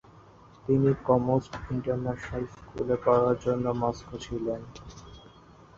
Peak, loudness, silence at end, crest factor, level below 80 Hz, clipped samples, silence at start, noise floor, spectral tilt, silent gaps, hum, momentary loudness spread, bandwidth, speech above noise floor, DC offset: -10 dBFS; -28 LUFS; 0.55 s; 20 dB; -50 dBFS; under 0.1%; 0.65 s; -53 dBFS; -8 dB/octave; none; none; 16 LU; 7.6 kHz; 26 dB; under 0.1%